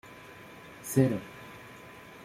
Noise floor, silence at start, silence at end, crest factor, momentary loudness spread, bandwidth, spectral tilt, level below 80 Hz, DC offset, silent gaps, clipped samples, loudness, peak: -49 dBFS; 0.05 s; 0 s; 24 dB; 21 LU; 16 kHz; -6.5 dB/octave; -64 dBFS; under 0.1%; none; under 0.1%; -29 LUFS; -10 dBFS